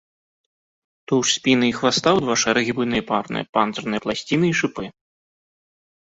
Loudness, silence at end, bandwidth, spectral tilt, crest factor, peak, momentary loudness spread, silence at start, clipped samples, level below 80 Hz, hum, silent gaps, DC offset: -20 LUFS; 1.15 s; 8.4 kHz; -3.5 dB/octave; 20 dB; -2 dBFS; 7 LU; 1.1 s; under 0.1%; -56 dBFS; none; 3.49-3.53 s; under 0.1%